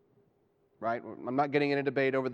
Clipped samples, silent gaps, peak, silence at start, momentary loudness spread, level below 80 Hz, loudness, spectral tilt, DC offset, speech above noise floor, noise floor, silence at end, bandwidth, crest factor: under 0.1%; none; -14 dBFS; 0.8 s; 8 LU; -80 dBFS; -31 LUFS; -8 dB/octave; under 0.1%; 40 dB; -70 dBFS; 0 s; 6.8 kHz; 18 dB